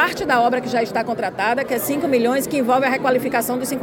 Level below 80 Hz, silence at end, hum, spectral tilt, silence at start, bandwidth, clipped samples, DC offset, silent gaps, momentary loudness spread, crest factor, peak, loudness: -56 dBFS; 0 s; none; -4 dB/octave; 0 s; 17 kHz; under 0.1%; under 0.1%; none; 4 LU; 16 dB; -4 dBFS; -19 LUFS